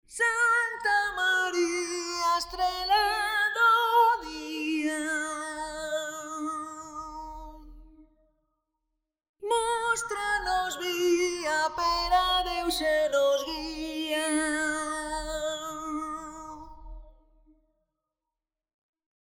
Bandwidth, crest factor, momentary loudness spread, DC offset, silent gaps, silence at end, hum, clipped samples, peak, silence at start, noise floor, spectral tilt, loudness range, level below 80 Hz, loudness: over 20 kHz; 18 dB; 15 LU; under 0.1%; 9.29-9.34 s; 2.2 s; none; under 0.1%; -12 dBFS; 0.1 s; -89 dBFS; -1.5 dB/octave; 13 LU; -52 dBFS; -27 LUFS